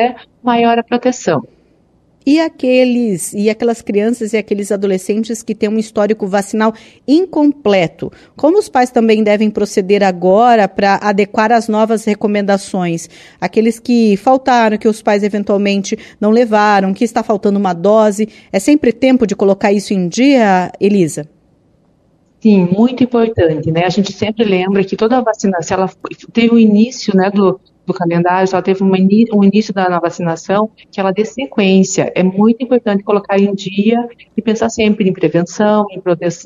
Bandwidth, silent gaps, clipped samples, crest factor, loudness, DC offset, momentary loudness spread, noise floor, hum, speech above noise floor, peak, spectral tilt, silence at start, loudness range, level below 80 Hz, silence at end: 13 kHz; none; under 0.1%; 12 dB; -13 LUFS; under 0.1%; 7 LU; -53 dBFS; none; 41 dB; 0 dBFS; -6 dB/octave; 0 s; 3 LU; -52 dBFS; 0 s